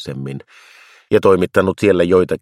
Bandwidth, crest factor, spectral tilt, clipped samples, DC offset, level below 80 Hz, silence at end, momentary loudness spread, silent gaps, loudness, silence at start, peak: 13.5 kHz; 16 dB; -7 dB/octave; under 0.1%; under 0.1%; -50 dBFS; 0.05 s; 15 LU; none; -14 LUFS; 0 s; 0 dBFS